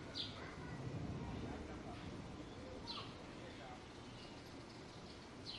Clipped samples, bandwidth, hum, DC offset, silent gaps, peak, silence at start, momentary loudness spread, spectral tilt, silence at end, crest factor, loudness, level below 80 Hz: under 0.1%; 11 kHz; none; under 0.1%; none; -32 dBFS; 0 s; 7 LU; -5 dB/octave; 0 s; 18 dB; -50 LUFS; -62 dBFS